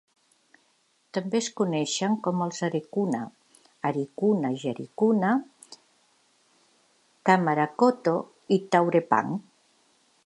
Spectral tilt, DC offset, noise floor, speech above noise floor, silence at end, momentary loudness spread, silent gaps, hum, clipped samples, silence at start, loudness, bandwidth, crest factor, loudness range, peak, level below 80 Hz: -5.5 dB/octave; under 0.1%; -68 dBFS; 43 dB; 0.85 s; 11 LU; none; none; under 0.1%; 1.15 s; -26 LUFS; 11.5 kHz; 22 dB; 4 LU; -6 dBFS; -78 dBFS